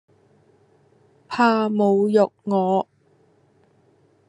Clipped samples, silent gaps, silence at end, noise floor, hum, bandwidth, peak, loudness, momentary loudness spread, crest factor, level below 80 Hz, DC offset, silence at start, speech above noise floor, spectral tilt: under 0.1%; none; 1.45 s; -59 dBFS; none; 10 kHz; -4 dBFS; -20 LUFS; 8 LU; 18 dB; -74 dBFS; under 0.1%; 1.3 s; 41 dB; -7 dB/octave